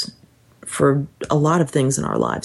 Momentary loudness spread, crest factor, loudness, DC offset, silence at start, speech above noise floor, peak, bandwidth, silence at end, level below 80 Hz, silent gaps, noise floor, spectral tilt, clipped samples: 12 LU; 16 dB; -20 LUFS; under 0.1%; 0 s; 34 dB; -4 dBFS; 12.5 kHz; 0 s; -52 dBFS; none; -52 dBFS; -6 dB/octave; under 0.1%